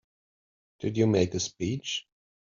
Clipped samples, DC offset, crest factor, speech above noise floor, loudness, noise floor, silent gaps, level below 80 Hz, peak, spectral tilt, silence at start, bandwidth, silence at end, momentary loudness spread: under 0.1%; under 0.1%; 20 dB; over 63 dB; -29 LUFS; under -90 dBFS; none; -64 dBFS; -10 dBFS; -5.5 dB/octave; 0.8 s; 7.6 kHz; 0.45 s; 10 LU